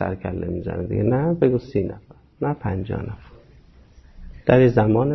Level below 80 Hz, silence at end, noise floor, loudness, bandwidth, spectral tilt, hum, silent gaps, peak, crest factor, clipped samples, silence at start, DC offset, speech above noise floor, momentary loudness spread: -42 dBFS; 0 s; -49 dBFS; -21 LUFS; 6 kHz; -10 dB/octave; none; none; -4 dBFS; 18 dB; under 0.1%; 0 s; under 0.1%; 29 dB; 14 LU